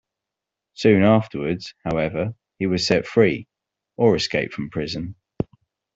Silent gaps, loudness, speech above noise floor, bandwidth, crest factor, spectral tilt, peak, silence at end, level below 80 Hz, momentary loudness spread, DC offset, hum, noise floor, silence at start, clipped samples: none; -22 LUFS; 65 dB; 8 kHz; 20 dB; -6 dB/octave; -4 dBFS; 0.55 s; -52 dBFS; 14 LU; under 0.1%; none; -85 dBFS; 0.8 s; under 0.1%